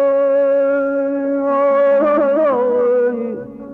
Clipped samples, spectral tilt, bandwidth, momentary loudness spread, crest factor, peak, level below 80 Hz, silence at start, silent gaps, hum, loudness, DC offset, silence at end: under 0.1%; -8.5 dB/octave; 3.7 kHz; 6 LU; 8 dB; -6 dBFS; -58 dBFS; 0 s; none; 50 Hz at -60 dBFS; -15 LUFS; under 0.1%; 0 s